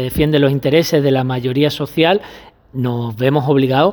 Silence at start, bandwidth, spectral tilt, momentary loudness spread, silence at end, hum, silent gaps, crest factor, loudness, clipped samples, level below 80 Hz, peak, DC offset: 0 s; over 20 kHz; -6.5 dB/octave; 7 LU; 0 s; none; none; 14 dB; -15 LUFS; under 0.1%; -40 dBFS; 0 dBFS; under 0.1%